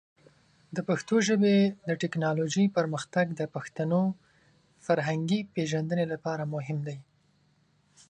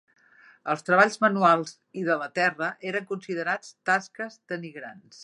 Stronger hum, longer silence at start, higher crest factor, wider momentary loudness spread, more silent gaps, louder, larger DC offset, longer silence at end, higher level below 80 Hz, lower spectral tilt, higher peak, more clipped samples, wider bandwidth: neither; about the same, 0.7 s vs 0.65 s; about the same, 18 dB vs 22 dB; second, 11 LU vs 17 LU; neither; second, -29 LUFS vs -25 LUFS; neither; first, 1.05 s vs 0 s; first, -72 dBFS vs -82 dBFS; about the same, -6 dB/octave vs -5 dB/octave; second, -10 dBFS vs -4 dBFS; neither; second, 9.6 kHz vs 11.5 kHz